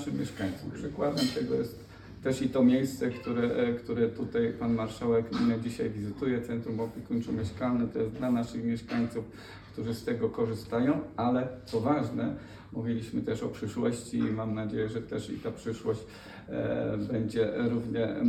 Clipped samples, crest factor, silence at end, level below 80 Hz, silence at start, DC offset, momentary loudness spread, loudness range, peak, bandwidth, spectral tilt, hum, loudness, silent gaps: under 0.1%; 16 dB; 0 s; -56 dBFS; 0 s; under 0.1%; 8 LU; 4 LU; -14 dBFS; 13.5 kHz; -7 dB/octave; none; -31 LUFS; none